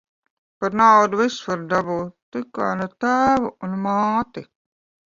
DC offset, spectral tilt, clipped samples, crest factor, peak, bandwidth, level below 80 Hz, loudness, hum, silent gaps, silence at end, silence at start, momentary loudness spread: under 0.1%; -5.5 dB/octave; under 0.1%; 20 dB; -2 dBFS; 7.6 kHz; -56 dBFS; -20 LUFS; none; 2.22-2.32 s; 0.7 s; 0.6 s; 16 LU